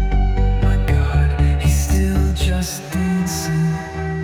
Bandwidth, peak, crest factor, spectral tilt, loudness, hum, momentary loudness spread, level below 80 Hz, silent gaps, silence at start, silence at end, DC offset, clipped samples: 16.5 kHz; -4 dBFS; 12 dB; -6 dB/octave; -19 LUFS; none; 5 LU; -20 dBFS; none; 0 s; 0 s; under 0.1%; under 0.1%